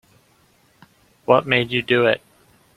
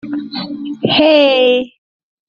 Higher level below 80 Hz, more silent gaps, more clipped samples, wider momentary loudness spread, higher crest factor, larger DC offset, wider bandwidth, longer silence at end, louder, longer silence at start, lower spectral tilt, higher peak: about the same, -60 dBFS vs -56 dBFS; neither; neither; second, 9 LU vs 15 LU; first, 22 dB vs 14 dB; neither; first, 13.5 kHz vs 6.8 kHz; about the same, 0.6 s vs 0.6 s; second, -18 LUFS vs -12 LUFS; first, 1.3 s vs 0.05 s; first, -6.5 dB/octave vs -2 dB/octave; about the same, -2 dBFS vs -2 dBFS